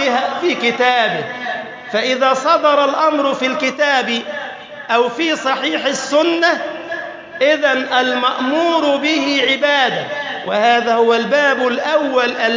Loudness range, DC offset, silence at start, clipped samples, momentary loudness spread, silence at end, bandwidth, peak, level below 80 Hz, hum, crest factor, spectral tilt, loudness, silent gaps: 2 LU; under 0.1%; 0 s; under 0.1%; 10 LU; 0 s; 7.6 kHz; -2 dBFS; -68 dBFS; none; 14 dB; -3 dB/octave; -15 LUFS; none